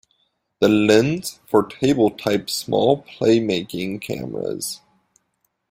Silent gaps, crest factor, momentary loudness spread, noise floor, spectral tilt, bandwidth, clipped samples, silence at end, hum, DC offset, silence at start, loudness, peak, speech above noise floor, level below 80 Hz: none; 18 dB; 12 LU; -71 dBFS; -5 dB/octave; 16 kHz; under 0.1%; 0.95 s; none; under 0.1%; 0.6 s; -20 LUFS; -2 dBFS; 52 dB; -56 dBFS